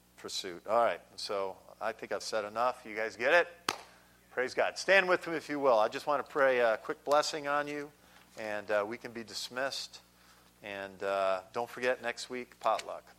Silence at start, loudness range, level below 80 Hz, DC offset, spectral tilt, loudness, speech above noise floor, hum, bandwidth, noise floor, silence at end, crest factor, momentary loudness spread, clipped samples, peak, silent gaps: 0.2 s; 8 LU; -74 dBFS; under 0.1%; -2.5 dB/octave; -32 LUFS; 29 dB; 60 Hz at -70 dBFS; 16.5 kHz; -62 dBFS; 0.05 s; 24 dB; 14 LU; under 0.1%; -10 dBFS; none